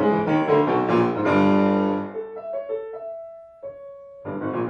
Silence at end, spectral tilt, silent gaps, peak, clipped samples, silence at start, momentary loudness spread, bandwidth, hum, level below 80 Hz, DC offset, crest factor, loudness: 0 s; -8.5 dB/octave; none; -8 dBFS; under 0.1%; 0 s; 21 LU; 7 kHz; none; -64 dBFS; under 0.1%; 16 dB; -22 LUFS